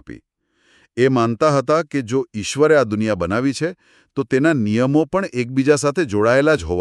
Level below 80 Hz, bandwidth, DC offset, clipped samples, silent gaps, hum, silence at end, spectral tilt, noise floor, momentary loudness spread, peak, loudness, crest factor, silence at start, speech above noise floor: -46 dBFS; 12 kHz; under 0.1%; under 0.1%; none; none; 0 s; -6 dB/octave; -64 dBFS; 8 LU; -2 dBFS; -18 LUFS; 16 dB; 0.1 s; 46 dB